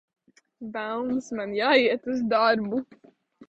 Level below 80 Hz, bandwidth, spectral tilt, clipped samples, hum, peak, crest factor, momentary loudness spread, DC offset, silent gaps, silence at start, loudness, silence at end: -66 dBFS; 8 kHz; -5 dB/octave; under 0.1%; none; -6 dBFS; 20 dB; 13 LU; under 0.1%; none; 0.6 s; -25 LUFS; 0.05 s